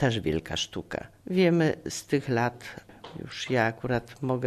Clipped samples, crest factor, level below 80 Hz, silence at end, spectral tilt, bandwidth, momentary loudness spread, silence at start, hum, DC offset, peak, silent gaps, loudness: under 0.1%; 20 dB; -54 dBFS; 0 s; -5.5 dB/octave; 13.5 kHz; 19 LU; 0 s; none; under 0.1%; -8 dBFS; none; -28 LUFS